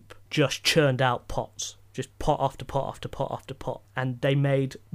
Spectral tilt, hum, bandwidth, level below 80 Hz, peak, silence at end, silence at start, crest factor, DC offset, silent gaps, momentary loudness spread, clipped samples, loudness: -5 dB/octave; none; 15.5 kHz; -46 dBFS; -8 dBFS; 0.2 s; 0.1 s; 18 dB; under 0.1%; none; 13 LU; under 0.1%; -27 LUFS